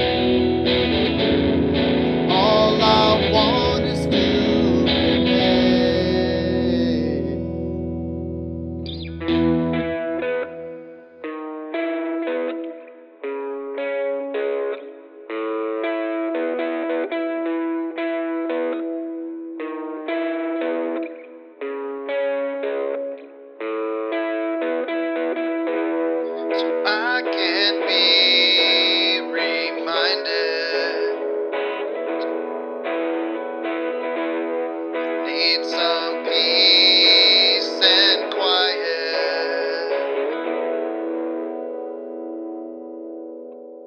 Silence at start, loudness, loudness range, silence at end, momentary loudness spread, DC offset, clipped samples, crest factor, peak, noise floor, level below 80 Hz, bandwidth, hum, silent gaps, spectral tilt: 0 s; -20 LUFS; 12 LU; 0 s; 16 LU; under 0.1%; under 0.1%; 20 dB; 0 dBFS; -41 dBFS; -44 dBFS; 9 kHz; none; none; -5.5 dB/octave